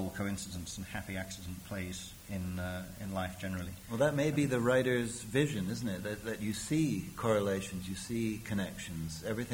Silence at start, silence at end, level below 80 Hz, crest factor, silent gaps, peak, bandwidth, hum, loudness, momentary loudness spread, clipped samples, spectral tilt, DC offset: 0 s; 0 s; -56 dBFS; 20 dB; none; -16 dBFS; over 20 kHz; none; -35 LUFS; 11 LU; under 0.1%; -5.5 dB/octave; under 0.1%